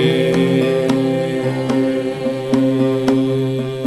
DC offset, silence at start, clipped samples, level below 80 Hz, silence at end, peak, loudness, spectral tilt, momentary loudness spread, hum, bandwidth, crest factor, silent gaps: 0.2%; 0 s; under 0.1%; -52 dBFS; 0 s; -2 dBFS; -17 LUFS; -7 dB/octave; 5 LU; none; 12.5 kHz; 14 dB; none